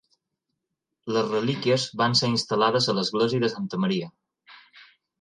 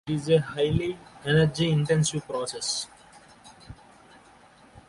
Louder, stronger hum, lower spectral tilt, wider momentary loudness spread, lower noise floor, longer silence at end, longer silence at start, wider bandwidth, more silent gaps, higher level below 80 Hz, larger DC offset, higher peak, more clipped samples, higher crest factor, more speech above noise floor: about the same, -24 LUFS vs -26 LUFS; neither; about the same, -5 dB/octave vs -5 dB/octave; second, 7 LU vs 11 LU; first, -82 dBFS vs -54 dBFS; first, 0.4 s vs 0.1 s; first, 1.05 s vs 0.05 s; about the same, 11 kHz vs 11.5 kHz; neither; second, -68 dBFS vs -50 dBFS; neither; about the same, -8 dBFS vs -10 dBFS; neither; about the same, 18 dB vs 18 dB; first, 58 dB vs 29 dB